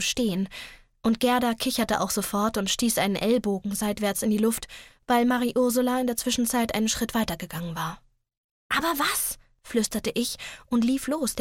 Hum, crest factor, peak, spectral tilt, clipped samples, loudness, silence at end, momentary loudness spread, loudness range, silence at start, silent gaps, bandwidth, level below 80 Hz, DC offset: none; 16 dB; -10 dBFS; -3.5 dB/octave; under 0.1%; -26 LUFS; 0 s; 9 LU; 3 LU; 0 s; 8.37-8.70 s; 17.5 kHz; -52 dBFS; under 0.1%